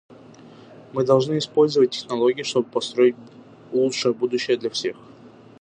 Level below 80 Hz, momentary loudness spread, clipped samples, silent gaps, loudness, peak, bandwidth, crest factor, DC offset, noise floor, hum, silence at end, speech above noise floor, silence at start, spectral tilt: -70 dBFS; 9 LU; under 0.1%; none; -22 LUFS; -4 dBFS; 9.6 kHz; 18 dB; under 0.1%; -46 dBFS; none; 0.35 s; 26 dB; 0.1 s; -5 dB/octave